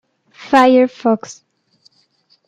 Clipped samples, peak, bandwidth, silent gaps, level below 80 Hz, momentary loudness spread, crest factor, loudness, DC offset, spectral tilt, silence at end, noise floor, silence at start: under 0.1%; -2 dBFS; 9.2 kHz; none; -66 dBFS; 11 LU; 16 dB; -13 LUFS; under 0.1%; -5 dB/octave; 1.15 s; -58 dBFS; 0.5 s